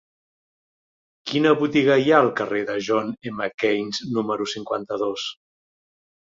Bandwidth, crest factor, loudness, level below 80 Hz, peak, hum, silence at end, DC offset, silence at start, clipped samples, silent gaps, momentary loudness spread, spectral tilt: 7.8 kHz; 20 dB; -22 LUFS; -66 dBFS; -4 dBFS; none; 1 s; under 0.1%; 1.25 s; under 0.1%; 3.54-3.58 s; 11 LU; -5 dB/octave